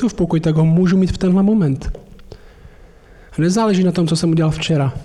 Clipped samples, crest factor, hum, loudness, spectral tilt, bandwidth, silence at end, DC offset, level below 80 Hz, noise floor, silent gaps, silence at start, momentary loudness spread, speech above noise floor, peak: under 0.1%; 8 dB; none; -16 LUFS; -7 dB/octave; 11.5 kHz; 0 s; under 0.1%; -36 dBFS; -43 dBFS; none; 0 s; 8 LU; 28 dB; -8 dBFS